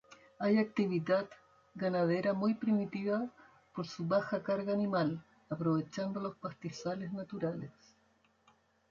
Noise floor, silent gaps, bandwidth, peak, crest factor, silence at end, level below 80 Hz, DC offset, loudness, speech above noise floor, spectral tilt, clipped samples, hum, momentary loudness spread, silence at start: -71 dBFS; none; 7.4 kHz; -20 dBFS; 16 dB; 1.2 s; -74 dBFS; under 0.1%; -35 LUFS; 37 dB; -7.5 dB/octave; under 0.1%; none; 13 LU; 0.1 s